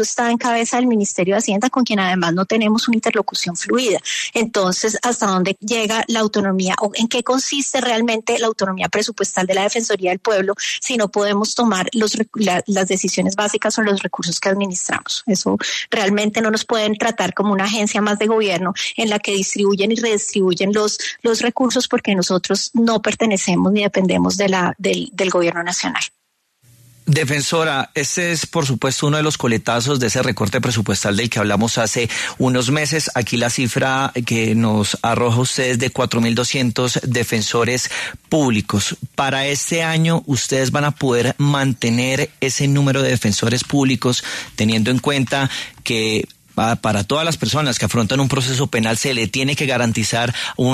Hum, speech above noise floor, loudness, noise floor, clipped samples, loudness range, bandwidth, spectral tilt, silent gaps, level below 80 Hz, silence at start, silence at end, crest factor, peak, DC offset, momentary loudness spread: none; 42 dB; -18 LUFS; -60 dBFS; under 0.1%; 1 LU; 13.5 kHz; -4 dB/octave; none; -52 dBFS; 0 s; 0 s; 14 dB; -4 dBFS; under 0.1%; 3 LU